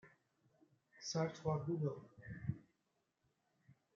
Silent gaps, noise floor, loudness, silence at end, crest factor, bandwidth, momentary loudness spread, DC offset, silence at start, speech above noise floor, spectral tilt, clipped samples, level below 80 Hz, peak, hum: none; -85 dBFS; -43 LUFS; 0.25 s; 20 dB; 7.6 kHz; 14 LU; under 0.1%; 0.05 s; 44 dB; -6.5 dB/octave; under 0.1%; -74 dBFS; -26 dBFS; none